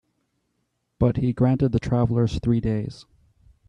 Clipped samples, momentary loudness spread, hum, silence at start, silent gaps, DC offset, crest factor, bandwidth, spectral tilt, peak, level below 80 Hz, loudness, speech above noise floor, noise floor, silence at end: under 0.1%; 6 LU; none; 1 s; none; under 0.1%; 16 dB; 7.8 kHz; -9 dB/octave; -8 dBFS; -42 dBFS; -23 LUFS; 52 dB; -74 dBFS; 0.65 s